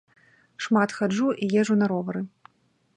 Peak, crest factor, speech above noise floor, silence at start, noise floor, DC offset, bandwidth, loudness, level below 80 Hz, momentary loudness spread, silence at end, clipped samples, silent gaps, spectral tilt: -8 dBFS; 18 dB; 44 dB; 0.6 s; -67 dBFS; under 0.1%; 9.8 kHz; -24 LUFS; -72 dBFS; 12 LU; 0.7 s; under 0.1%; none; -6 dB/octave